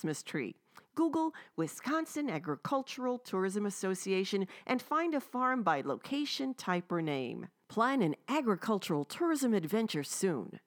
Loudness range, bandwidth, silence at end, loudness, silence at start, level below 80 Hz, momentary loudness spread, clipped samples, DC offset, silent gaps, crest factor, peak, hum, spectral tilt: 2 LU; over 20 kHz; 0.1 s; -34 LUFS; 0 s; -88 dBFS; 7 LU; under 0.1%; under 0.1%; none; 18 dB; -16 dBFS; none; -5 dB/octave